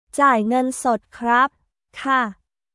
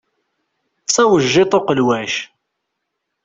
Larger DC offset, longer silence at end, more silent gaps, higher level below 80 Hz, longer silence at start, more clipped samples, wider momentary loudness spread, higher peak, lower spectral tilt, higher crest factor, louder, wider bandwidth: neither; second, 0.4 s vs 1 s; neither; second, -62 dBFS vs -56 dBFS; second, 0.15 s vs 0.9 s; neither; second, 7 LU vs 12 LU; about the same, -4 dBFS vs -2 dBFS; about the same, -4 dB/octave vs -4 dB/octave; about the same, 16 dB vs 16 dB; second, -20 LUFS vs -15 LUFS; first, 12 kHz vs 8 kHz